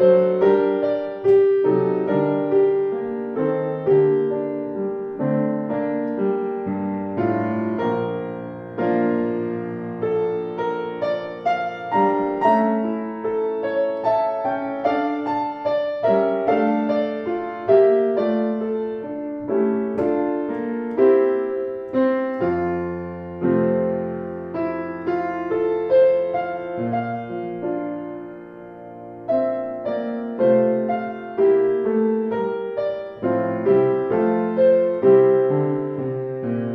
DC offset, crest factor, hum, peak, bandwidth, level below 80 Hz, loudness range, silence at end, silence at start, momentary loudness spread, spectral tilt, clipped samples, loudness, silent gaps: under 0.1%; 16 dB; none; -4 dBFS; 5.4 kHz; -60 dBFS; 5 LU; 0 s; 0 s; 10 LU; -9.5 dB/octave; under 0.1%; -21 LUFS; none